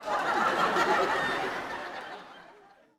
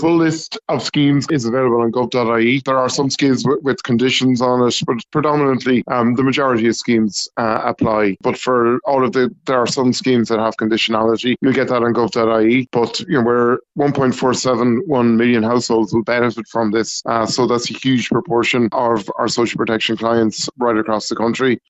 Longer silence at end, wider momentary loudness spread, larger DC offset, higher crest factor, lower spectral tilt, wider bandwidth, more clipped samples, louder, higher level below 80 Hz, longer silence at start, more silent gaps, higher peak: first, 0.45 s vs 0.1 s; first, 17 LU vs 4 LU; neither; about the same, 18 dB vs 16 dB; second, -3.5 dB/octave vs -5 dB/octave; first, 17.5 kHz vs 8.2 kHz; neither; second, -28 LUFS vs -16 LUFS; second, -64 dBFS vs -54 dBFS; about the same, 0 s vs 0 s; neither; second, -12 dBFS vs 0 dBFS